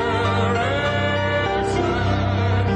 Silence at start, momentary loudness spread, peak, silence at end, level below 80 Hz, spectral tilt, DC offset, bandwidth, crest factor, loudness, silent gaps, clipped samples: 0 s; 1 LU; -8 dBFS; 0 s; -36 dBFS; -6.5 dB/octave; under 0.1%; 9.4 kHz; 12 dB; -20 LUFS; none; under 0.1%